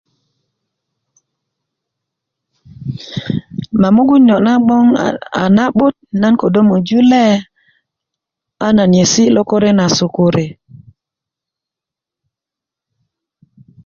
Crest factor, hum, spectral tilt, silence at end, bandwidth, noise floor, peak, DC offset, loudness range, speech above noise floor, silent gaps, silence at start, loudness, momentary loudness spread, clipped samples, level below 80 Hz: 14 dB; none; -5.5 dB/octave; 3.35 s; 7.4 kHz; -85 dBFS; 0 dBFS; under 0.1%; 11 LU; 74 dB; none; 2.8 s; -12 LUFS; 12 LU; under 0.1%; -48 dBFS